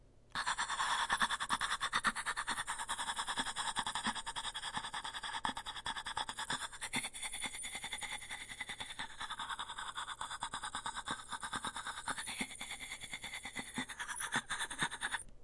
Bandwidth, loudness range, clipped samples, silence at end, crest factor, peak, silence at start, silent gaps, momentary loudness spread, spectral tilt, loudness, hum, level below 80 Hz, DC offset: 12 kHz; 6 LU; under 0.1%; 0 s; 22 dB; -18 dBFS; 0 s; none; 8 LU; -0.5 dB/octave; -39 LUFS; none; -62 dBFS; under 0.1%